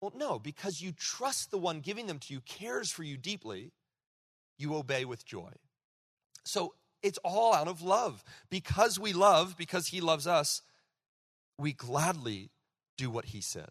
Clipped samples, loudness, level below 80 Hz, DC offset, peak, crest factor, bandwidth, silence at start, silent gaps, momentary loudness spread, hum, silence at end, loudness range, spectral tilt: under 0.1%; -33 LUFS; -66 dBFS; under 0.1%; -12 dBFS; 22 dB; 13.5 kHz; 0 s; 4.07-4.56 s, 5.84-6.17 s, 6.26-6.30 s, 11.08-11.52 s, 12.89-12.97 s; 15 LU; none; 0.05 s; 10 LU; -3.5 dB/octave